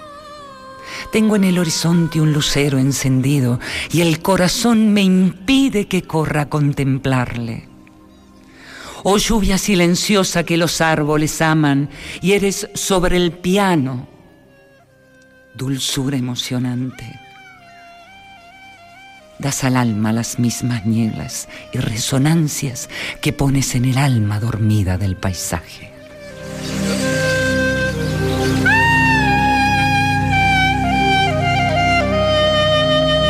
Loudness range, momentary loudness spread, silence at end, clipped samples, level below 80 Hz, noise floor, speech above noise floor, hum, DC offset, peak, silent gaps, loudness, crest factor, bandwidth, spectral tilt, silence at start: 9 LU; 12 LU; 0 s; under 0.1%; -34 dBFS; -49 dBFS; 32 dB; none; under 0.1%; -4 dBFS; none; -16 LUFS; 14 dB; 15.5 kHz; -5 dB/octave; 0 s